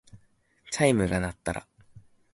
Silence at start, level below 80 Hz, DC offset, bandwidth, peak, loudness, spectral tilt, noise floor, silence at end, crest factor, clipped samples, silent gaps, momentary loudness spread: 0.15 s; -48 dBFS; under 0.1%; 11.5 kHz; -8 dBFS; -27 LUFS; -5 dB/octave; -64 dBFS; 0.35 s; 22 dB; under 0.1%; none; 13 LU